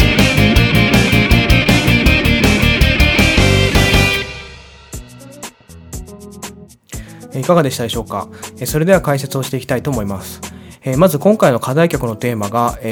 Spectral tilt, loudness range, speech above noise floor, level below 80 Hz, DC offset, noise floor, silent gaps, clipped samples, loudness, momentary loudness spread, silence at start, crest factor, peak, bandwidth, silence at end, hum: -5 dB/octave; 10 LU; 21 dB; -24 dBFS; under 0.1%; -36 dBFS; none; under 0.1%; -13 LUFS; 21 LU; 0 s; 14 dB; 0 dBFS; over 20 kHz; 0 s; none